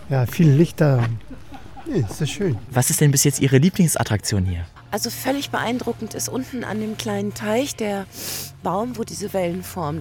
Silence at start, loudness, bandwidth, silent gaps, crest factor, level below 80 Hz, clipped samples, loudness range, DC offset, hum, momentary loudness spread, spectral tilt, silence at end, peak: 0 s; -21 LUFS; 18.5 kHz; none; 18 dB; -46 dBFS; under 0.1%; 6 LU; under 0.1%; none; 12 LU; -5 dB/octave; 0 s; -2 dBFS